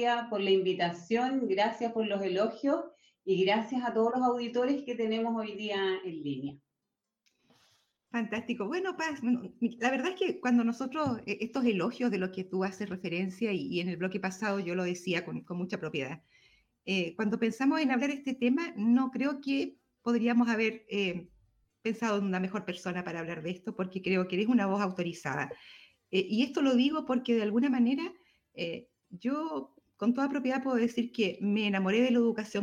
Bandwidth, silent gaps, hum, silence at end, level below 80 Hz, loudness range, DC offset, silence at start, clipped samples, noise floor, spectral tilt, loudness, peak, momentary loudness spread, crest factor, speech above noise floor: 9.8 kHz; none; none; 0 s; -76 dBFS; 5 LU; under 0.1%; 0 s; under 0.1%; -87 dBFS; -6 dB/octave; -31 LUFS; -16 dBFS; 10 LU; 16 dB; 57 dB